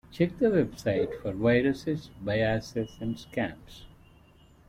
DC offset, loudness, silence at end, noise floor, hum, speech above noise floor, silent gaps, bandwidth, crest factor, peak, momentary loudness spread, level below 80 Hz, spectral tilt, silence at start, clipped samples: under 0.1%; -29 LUFS; 0.8 s; -57 dBFS; none; 29 dB; none; 15.5 kHz; 18 dB; -12 dBFS; 10 LU; -52 dBFS; -7 dB/octave; 0.1 s; under 0.1%